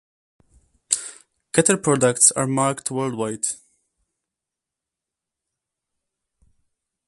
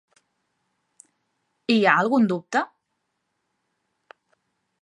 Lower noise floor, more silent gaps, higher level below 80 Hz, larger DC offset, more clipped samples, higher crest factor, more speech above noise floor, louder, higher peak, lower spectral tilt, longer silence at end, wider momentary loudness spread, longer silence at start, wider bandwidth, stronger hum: first, -86 dBFS vs -77 dBFS; neither; first, -64 dBFS vs -80 dBFS; neither; neither; about the same, 26 dB vs 24 dB; first, 66 dB vs 57 dB; about the same, -20 LUFS vs -21 LUFS; first, 0 dBFS vs -4 dBFS; second, -3.5 dB/octave vs -5.5 dB/octave; first, 3.55 s vs 2.15 s; second, 11 LU vs 15 LU; second, 0.9 s vs 1.7 s; about the same, 12 kHz vs 11 kHz; neither